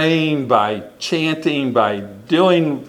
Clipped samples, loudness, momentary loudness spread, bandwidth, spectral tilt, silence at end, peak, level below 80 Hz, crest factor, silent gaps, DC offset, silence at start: under 0.1%; -17 LUFS; 8 LU; 12.5 kHz; -6 dB/octave; 0 s; 0 dBFS; -62 dBFS; 18 dB; none; under 0.1%; 0 s